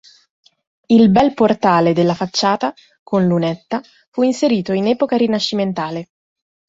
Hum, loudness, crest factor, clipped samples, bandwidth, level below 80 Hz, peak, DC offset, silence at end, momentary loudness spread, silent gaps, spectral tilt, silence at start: none; -16 LUFS; 16 dB; under 0.1%; 7.8 kHz; -54 dBFS; -2 dBFS; under 0.1%; 0.65 s; 12 LU; 2.99-3.06 s, 4.07-4.12 s; -6 dB/octave; 0.9 s